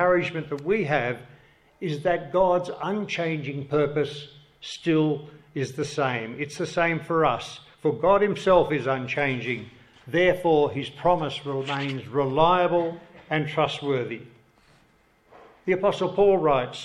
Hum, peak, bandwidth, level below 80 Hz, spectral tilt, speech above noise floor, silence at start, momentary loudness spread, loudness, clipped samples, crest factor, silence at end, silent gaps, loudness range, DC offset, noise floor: none; -6 dBFS; 12 kHz; -54 dBFS; -6 dB/octave; 37 dB; 0 s; 12 LU; -25 LUFS; under 0.1%; 20 dB; 0 s; none; 4 LU; under 0.1%; -61 dBFS